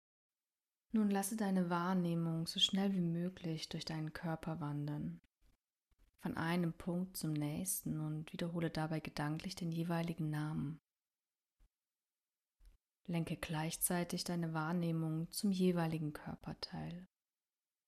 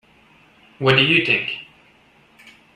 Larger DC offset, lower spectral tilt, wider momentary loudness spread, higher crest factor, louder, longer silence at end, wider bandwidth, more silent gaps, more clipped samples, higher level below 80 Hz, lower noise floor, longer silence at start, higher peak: neither; about the same, -5 dB/octave vs -6 dB/octave; second, 10 LU vs 14 LU; about the same, 22 dB vs 22 dB; second, -39 LUFS vs -16 LUFS; second, 0.8 s vs 1.1 s; first, 14.5 kHz vs 11 kHz; neither; neither; second, -68 dBFS vs -58 dBFS; first, under -90 dBFS vs -54 dBFS; first, 0.95 s vs 0.8 s; second, -20 dBFS vs 0 dBFS